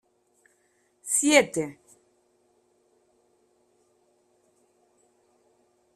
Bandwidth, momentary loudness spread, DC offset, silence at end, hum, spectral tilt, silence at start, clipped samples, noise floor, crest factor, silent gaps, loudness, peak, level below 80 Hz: 14.5 kHz; 18 LU; under 0.1%; 4.25 s; none; -2 dB/octave; 1.05 s; under 0.1%; -68 dBFS; 28 dB; none; -23 LUFS; -2 dBFS; -74 dBFS